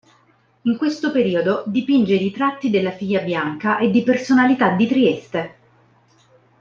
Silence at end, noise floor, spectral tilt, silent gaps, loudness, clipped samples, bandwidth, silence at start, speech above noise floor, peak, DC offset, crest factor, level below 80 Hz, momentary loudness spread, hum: 1.1 s; -58 dBFS; -6.5 dB/octave; none; -19 LUFS; under 0.1%; 7.4 kHz; 0.65 s; 40 dB; -2 dBFS; under 0.1%; 18 dB; -62 dBFS; 8 LU; none